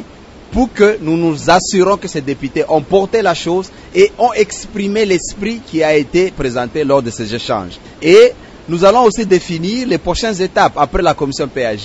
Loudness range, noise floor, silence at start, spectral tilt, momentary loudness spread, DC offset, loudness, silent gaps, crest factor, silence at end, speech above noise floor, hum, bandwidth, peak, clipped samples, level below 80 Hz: 3 LU; -36 dBFS; 0 s; -5 dB/octave; 10 LU; under 0.1%; -14 LUFS; none; 14 dB; 0 s; 23 dB; none; 8.2 kHz; 0 dBFS; 0.2%; -36 dBFS